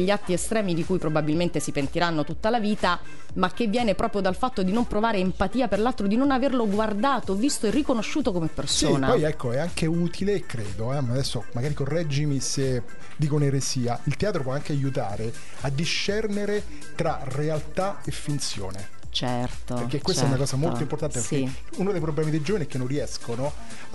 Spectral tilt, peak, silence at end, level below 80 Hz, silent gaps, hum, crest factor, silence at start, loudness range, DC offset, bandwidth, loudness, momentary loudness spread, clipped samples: -5 dB/octave; -6 dBFS; 0 s; -44 dBFS; none; none; 20 dB; 0 s; 4 LU; 3%; 11.5 kHz; -26 LUFS; 7 LU; under 0.1%